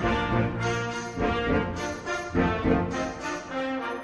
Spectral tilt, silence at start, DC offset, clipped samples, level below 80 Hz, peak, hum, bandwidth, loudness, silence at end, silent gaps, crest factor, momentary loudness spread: -6 dB/octave; 0 s; under 0.1%; under 0.1%; -40 dBFS; -10 dBFS; none; 11 kHz; -28 LUFS; 0 s; none; 18 dB; 7 LU